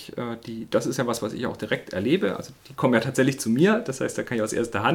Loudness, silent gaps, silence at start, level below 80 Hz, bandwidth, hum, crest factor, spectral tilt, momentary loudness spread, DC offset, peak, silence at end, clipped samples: -25 LUFS; none; 0 s; -60 dBFS; 18 kHz; none; 20 dB; -5.5 dB/octave; 12 LU; under 0.1%; -6 dBFS; 0 s; under 0.1%